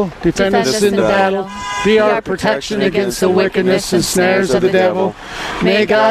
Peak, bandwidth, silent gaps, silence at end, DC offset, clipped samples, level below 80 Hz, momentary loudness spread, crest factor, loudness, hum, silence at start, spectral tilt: -2 dBFS; 14.5 kHz; none; 0 s; under 0.1%; under 0.1%; -40 dBFS; 6 LU; 12 dB; -14 LUFS; none; 0 s; -4.5 dB/octave